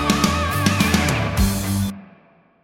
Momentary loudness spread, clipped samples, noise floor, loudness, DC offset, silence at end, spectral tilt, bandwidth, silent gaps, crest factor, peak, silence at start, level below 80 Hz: 7 LU; under 0.1%; -53 dBFS; -19 LUFS; under 0.1%; 0.6 s; -4.5 dB/octave; 16.5 kHz; none; 18 dB; -2 dBFS; 0 s; -30 dBFS